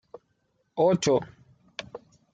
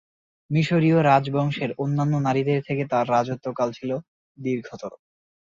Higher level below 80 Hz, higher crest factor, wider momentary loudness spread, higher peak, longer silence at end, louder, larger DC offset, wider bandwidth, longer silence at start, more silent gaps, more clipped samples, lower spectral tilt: about the same, -66 dBFS vs -62 dBFS; about the same, 18 dB vs 18 dB; first, 23 LU vs 13 LU; second, -12 dBFS vs -6 dBFS; about the same, 0.35 s vs 0.45 s; about the same, -24 LUFS vs -23 LUFS; neither; first, 9.4 kHz vs 7.6 kHz; first, 0.75 s vs 0.5 s; second, none vs 4.08-4.35 s; neither; second, -5.5 dB/octave vs -7.5 dB/octave